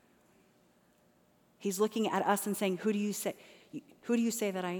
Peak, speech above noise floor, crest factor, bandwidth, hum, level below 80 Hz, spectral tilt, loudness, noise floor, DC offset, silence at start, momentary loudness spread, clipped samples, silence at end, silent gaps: -14 dBFS; 35 dB; 20 dB; over 20 kHz; 60 Hz at -65 dBFS; -84 dBFS; -4.5 dB/octave; -33 LUFS; -68 dBFS; under 0.1%; 1.6 s; 17 LU; under 0.1%; 0 s; none